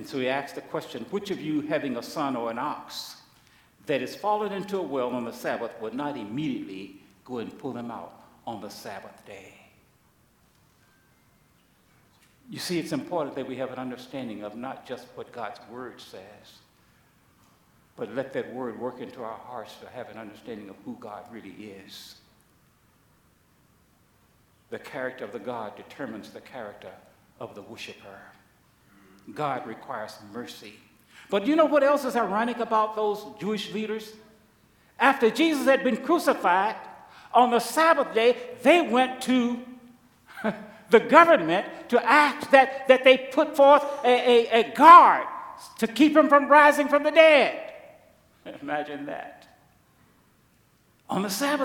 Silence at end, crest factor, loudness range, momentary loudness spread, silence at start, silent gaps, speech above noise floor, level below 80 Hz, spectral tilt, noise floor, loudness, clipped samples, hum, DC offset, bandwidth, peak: 0 s; 26 dB; 23 LU; 24 LU; 0 s; none; 39 dB; -72 dBFS; -4.5 dB/octave; -63 dBFS; -22 LUFS; under 0.1%; none; under 0.1%; 18.5 kHz; 0 dBFS